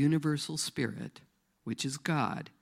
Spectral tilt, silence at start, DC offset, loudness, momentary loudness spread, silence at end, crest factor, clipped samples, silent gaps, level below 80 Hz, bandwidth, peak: -5 dB/octave; 0 s; under 0.1%; -33 LUFS; 14 LU; 0.1 s; 18 dB; under 0.1%; none; -72 dBFS; 15.5 kHz; -16 dBFS